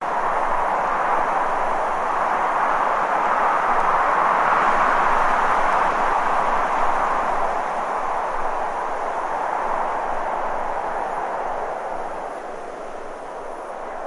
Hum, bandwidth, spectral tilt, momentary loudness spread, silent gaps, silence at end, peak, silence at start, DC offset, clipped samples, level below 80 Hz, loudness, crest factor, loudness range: none; 11.5 kHz; -4 dB/octave; 13 LU; none; 0 s; -4 dBFS; 0 s; under 0.1%; under 0.1%; -38 dBFS; -21 LUFS; 16 dB; 8 LU